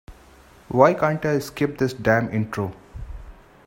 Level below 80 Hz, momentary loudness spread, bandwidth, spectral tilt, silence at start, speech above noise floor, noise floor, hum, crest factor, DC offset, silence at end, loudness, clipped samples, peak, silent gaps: -44 dBFS; 22 LU; 16.5 kHz; -7 dB/octave; 0.1 s; 29 dB; -50 dBFS; none; 22 dB; under 0.1%; 0.35 s; -22 LUFS; under 0.1%; 0 dBFS; none